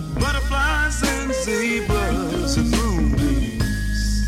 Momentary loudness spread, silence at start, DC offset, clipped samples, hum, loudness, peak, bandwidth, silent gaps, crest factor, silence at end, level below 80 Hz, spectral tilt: 3 LU; 0 s; under 0.1%; under 0.1%; none; -21 LUFS; -6 dBFS; 15.5 kHz; none; 14 dB; 0 s; -24 dBFS; -5 dB/octave